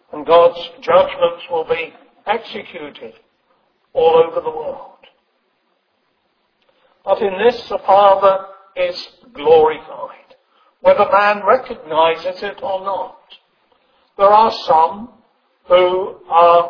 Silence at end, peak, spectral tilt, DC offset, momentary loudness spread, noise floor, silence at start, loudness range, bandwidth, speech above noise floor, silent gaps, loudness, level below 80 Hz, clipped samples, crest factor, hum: 0 s; 0 dBFS; -5.5 dB/octave; under 0.1%; 20 LU; -65 dBFS; 0.15 s; 6 LU; 5.4 kHz; 50 dB; none; -15 LUFS; -54 dBFS; under 0.1%; 16 dB; none